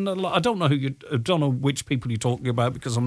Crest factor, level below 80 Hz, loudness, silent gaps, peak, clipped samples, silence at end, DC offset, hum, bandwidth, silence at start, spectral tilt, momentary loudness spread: 18 dB; -56 dBFS; -24 LUFS; none; -6 dBFS; under 0.1%; 0 s; under 0.1%; none; 11 kHz; 0 s; -6 dB/octave; 5 LU